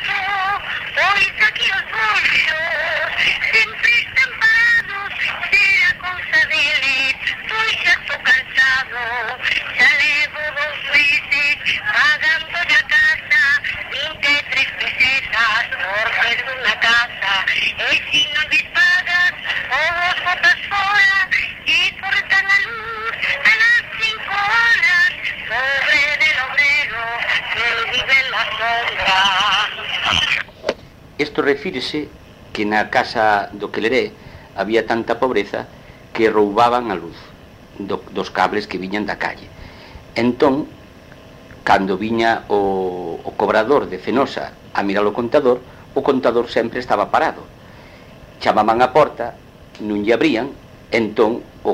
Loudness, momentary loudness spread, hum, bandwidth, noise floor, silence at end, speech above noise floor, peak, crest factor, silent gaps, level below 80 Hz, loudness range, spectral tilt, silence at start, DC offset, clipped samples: -16 LUFS; 11 LU; none; 16 kHz; -41 dBFS; 0 s; 23 dB; 0 dBFS; 18 dB; none; -48 dBFS; 6 LU; -3 dB/octave; 0 s; under 0.1%; under 0.1%